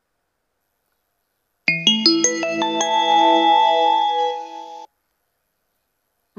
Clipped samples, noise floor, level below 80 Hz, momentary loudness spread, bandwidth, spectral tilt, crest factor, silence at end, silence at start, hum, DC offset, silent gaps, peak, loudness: under 0.1%; -74 dBFS; -80 dBFS; 10 LU; 7.8 kHz; -1.5 dB/octave; 20 dB; 1.55 s; 1.65 s; none; under 0.1%; none; 0 dBFS; -16 LUFS